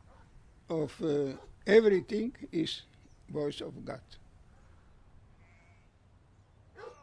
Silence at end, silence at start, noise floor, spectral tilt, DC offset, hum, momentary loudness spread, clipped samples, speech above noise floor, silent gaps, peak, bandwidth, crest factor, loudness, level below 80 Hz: 0.1 s; 0.35 s; -62 dBFS; -6 dB/octave; under 0.1%; none; 20 LU; under 0.1%; 32 dB; none; -10 dBFS; 10.5 kHz; 24 dB; -31 LUFS; -62 dBFS